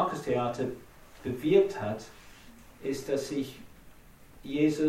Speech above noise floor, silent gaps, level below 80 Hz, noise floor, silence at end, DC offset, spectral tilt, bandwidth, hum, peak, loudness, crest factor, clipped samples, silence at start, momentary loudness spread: 24 dB; none; -58 dBFS; -53 dBFS; 0 s; under 0.1%; -6 dB/octave; 16 kHz; none; -12 dBFS; -31 LUFS; 20 dB; under 0.1%; 0 s; 23 LU